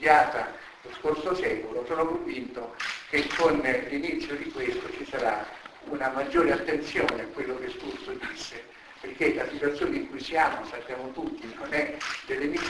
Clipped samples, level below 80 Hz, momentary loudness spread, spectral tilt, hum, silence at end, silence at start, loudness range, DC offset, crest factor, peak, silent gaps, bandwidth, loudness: under 0.1%; -56 dBFS; 13 LU; -4.5 dB/octave; none; 0 s; 0 s; 2 LU; under 0.1%; 26 dB; -4 dBFS; none; 11 kHz; -29 LUFS